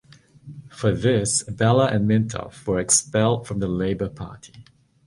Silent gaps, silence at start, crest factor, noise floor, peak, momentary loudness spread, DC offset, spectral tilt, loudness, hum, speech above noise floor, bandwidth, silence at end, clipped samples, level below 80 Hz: none; 0.45 s; 18 dB; -45 dBFS; -4 dBFS; 12 LU; under 0.1%; -4.5 dB/octave; -21 LUFS; none; 23 dB; 11.5 kHz; 0.45 s; under 0.1%; -46 dBFS